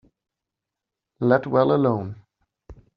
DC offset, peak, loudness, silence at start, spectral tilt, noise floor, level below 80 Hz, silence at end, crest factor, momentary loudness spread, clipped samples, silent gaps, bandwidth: under 0.1%; -4 dBFS; -21 LUFS; 1.2 s; -7 dB/octave; -86 dBFS; -58 dBFS; 0.25 s; 22 dB; 10 LU; under 0.1%; none; 5.4 kHz